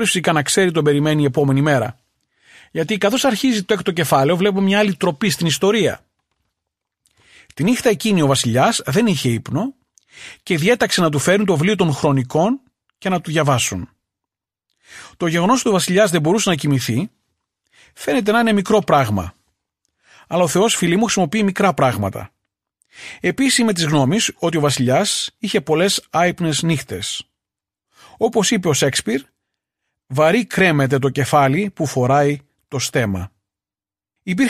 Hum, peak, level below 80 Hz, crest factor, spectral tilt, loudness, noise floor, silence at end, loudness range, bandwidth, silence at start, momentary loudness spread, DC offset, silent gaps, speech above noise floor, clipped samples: none; -2 dBFS; -52 dBFS; 16 dB; -4.5 dB/octave; -17 LUFS; under -90 dBFS; 0 s; 3 LU; 15 kHz; 0 s; 10 LU; under 0.1%; none; over 73 dB; under 0.1%